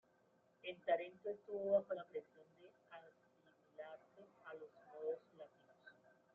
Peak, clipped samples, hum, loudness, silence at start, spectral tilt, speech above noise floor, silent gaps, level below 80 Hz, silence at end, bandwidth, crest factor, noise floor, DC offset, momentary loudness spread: -24 dBFS; under 0.1%; none; -45 LUFS; 0.65 s; -3 dB/octave; 33 dB; none; under -90 dBFS; 0.45 s; 4.2 kHz; 22 dB; -76 dBFS; under 0.1%; 26 LU